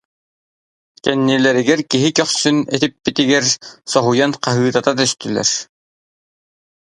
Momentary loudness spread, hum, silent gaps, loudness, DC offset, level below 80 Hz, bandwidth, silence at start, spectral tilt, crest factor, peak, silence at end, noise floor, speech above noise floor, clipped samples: 5 LU; none; none; -16 LUFS; under 0.1%; -58 dBFS; 11 kHz; 1.05 s; -3.5 dB/octave; 18 dB; 0 dBFS; 1.2 s; under -90 dBFS; over 74 dB; under 0.1%